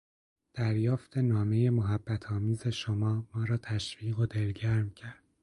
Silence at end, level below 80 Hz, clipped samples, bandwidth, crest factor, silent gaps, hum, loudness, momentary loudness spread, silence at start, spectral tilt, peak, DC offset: 0.3 s; -54 dBFS; under 0.1%; 11 kHz; 14 dB; none; none; -31 LUFS; 7 LU; 0.55 s; -7 dB/octave; -16 dBFS; under 0.1%